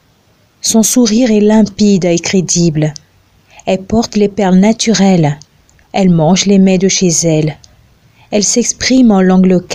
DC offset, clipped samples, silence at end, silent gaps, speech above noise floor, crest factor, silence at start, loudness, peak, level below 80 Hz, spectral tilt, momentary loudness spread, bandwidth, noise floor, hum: under 0.1%; under 0.1%; 0 s; none; 41 dB; 10 dB; 0.65 s; -10 LUFS; 0 dBFS; -40 dBFS; -5 dB/octave; 9 LU; 16 kHz; -51 dBFS; none